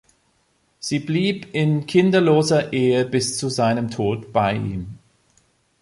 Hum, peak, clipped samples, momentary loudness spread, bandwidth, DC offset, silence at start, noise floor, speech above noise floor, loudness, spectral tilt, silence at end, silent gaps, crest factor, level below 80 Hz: none; -4 dBFS; under 0.1%; 10 LU; 11.5 kHz; under 0.1%; 0.8 s; -64 dBFS; 45 dB; -20 LUFS; -5.5 dB/octave; 0.85 s; none; 16 dB; -52 dBFS